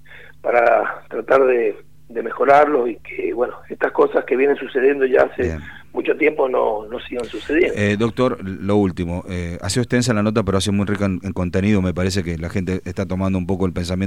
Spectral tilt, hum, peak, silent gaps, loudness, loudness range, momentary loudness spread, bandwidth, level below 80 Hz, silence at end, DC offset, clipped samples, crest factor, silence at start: -6 dB/octave; none; 0 dBFS; none; -19 LUFS; 3 LU; 11 LU; 15 kHz; -46 dBFS; 0 s; 0.8%; under 0.1%; 18 dB; 0.1 s